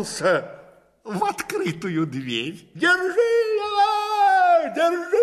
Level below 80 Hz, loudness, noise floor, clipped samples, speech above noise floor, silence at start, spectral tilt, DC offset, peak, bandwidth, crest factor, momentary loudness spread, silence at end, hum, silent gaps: -64 dBFS; -21 LUFS; -50 dBFS; under 0.1%; 27 dB; 0 s; -4.5 dB/octave; under 0.1%; -8 dBFS; 15 kHz; 14 dB; 9 LU; 0 s; none; none